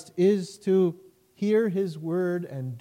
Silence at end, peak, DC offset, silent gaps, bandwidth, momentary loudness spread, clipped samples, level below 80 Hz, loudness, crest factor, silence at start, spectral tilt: 0 s; -12 dBFS; under 0.1%; none; 15.5 kHz; 8 LU; under 0.1%; -76 dBFS; -26 LUFS; 14 dB; 0 s; -7.5 dB/octave